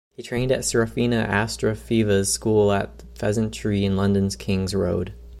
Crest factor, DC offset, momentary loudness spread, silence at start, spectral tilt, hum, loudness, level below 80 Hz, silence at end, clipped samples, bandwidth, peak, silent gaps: 16 dB; under 0.1%; 7 LU; 0.2 s; -5 dB/octave; none; -22 LUFS; -42 dBFS; 0 s; under 0.1%; 15 kHz; -6 dBFS; none